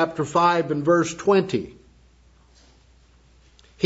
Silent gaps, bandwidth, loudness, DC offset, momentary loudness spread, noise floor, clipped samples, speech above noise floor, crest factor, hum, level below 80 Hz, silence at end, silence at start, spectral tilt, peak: none; 8 kHz; -21 LUFS; under 0.1%; 9 LU; -55 dBFS; under 0.1%; 34 dB; 20 dB; none; -56 dBFS; 0 s; 0 s; -5.5 dB/octave; -4 dBFS